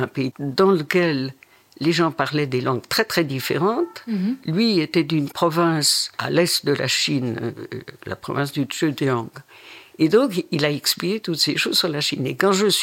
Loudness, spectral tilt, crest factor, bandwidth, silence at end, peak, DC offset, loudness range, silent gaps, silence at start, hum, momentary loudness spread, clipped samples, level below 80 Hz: -21 LUFS; -4 dB/octave; 18 dB; 17 kHz; 0 s; -4 dBFS; under 0.1%; 4 LU; none; 0 s; none; 9 LU; under 0.1%; -64 dBFS